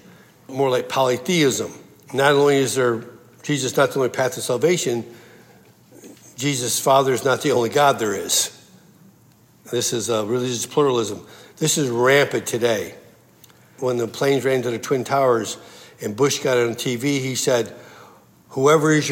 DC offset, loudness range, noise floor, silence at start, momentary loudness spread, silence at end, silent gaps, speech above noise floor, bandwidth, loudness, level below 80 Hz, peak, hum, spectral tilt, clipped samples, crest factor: under 0.1%; 3 LU; -53 dBFS; 0.5 s; 12 LU; 0 s; none; 34 dB; 16.5 kHz; -20 LUFS; -70 dBFS; -4 dBFS; none; -4 dB/octave; under 0.1%; 18 dB